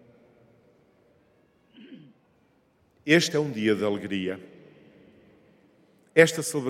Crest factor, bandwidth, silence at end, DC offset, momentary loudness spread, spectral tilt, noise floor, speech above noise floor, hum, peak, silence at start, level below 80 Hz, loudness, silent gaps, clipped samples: 26 dB; 16 kHz; 0 s; under 0.1%; 14 LU; -4.5 dB/octave; -65 dBFS; 41 dB; none; -4 dBFS; 1.8 s; -76 dBFS; -24 LUFS; none; under 0.1%